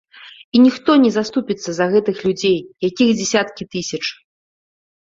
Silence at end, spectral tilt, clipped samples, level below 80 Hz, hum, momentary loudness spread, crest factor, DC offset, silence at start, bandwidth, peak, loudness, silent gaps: 0.9 s; -4.5 dB/octave; under 0.1%; -58 dBFS; none; 11 LU; 16 dB; under 0.1%; 0.25 s; 7.8 kHz; -2 dBFS; -17 LUFS; 0.44-0.52 s